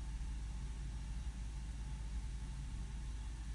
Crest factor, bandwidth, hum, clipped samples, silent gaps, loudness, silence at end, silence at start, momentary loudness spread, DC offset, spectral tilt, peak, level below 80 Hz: 10 dB; 11.5 kHz; none; under 0.1%; none; -47 LUFS; 0 s; 0 s; 1 LU; under 0.1%; -5 dB/octave; -34 dBFS; -44 dBFS